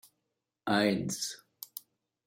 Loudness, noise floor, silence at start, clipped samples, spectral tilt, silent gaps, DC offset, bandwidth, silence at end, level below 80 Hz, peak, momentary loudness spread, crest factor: -31 LUFS; -85 dBFS; 0.65 s; under 0.1%; -4 dB/octave; none; under 0.1%; 16.5 kHz; 0.5 s; -76 dBFS; -14 dBFS; 17 LU; 22 dB